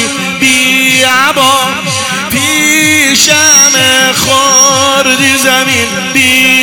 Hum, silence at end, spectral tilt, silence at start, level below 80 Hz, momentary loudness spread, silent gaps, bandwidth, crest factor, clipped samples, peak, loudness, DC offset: none; 0 s; -1 dB/octave; 0 s; -46 dBFS; 7 LU; none; over 20 kHz; 8 dB; 3%; 0 dBFS; -6 LUFS; under 0.1%